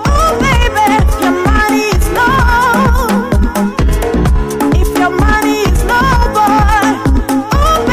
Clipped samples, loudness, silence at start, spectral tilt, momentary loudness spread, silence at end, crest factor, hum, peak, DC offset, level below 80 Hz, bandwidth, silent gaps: under 0.1%; -11 LUFS; 0 s; -5.5 dB/octave; 4 LU; 0 s; 8 dB; none; -2 dBFS; 0.4%; -14 dBFS; 16 kHz; none